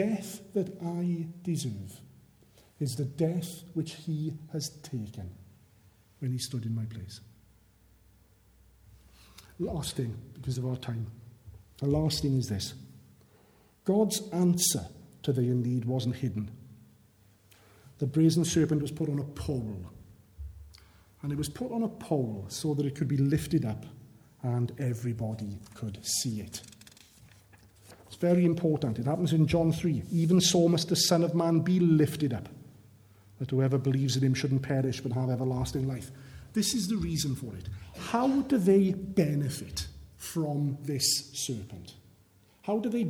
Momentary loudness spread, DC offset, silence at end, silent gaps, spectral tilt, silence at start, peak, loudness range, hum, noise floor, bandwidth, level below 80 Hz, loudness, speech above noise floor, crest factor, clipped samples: 17 LU; under 0.1%; 0 s; none; -5.5 dB/octave; 0 s; -12 dBFS; 11 LU; none; -62 dBFS; 18.5 kHz; -54 dBFS; -30 LUFS; 33 dB; 20 dB; under 0.1%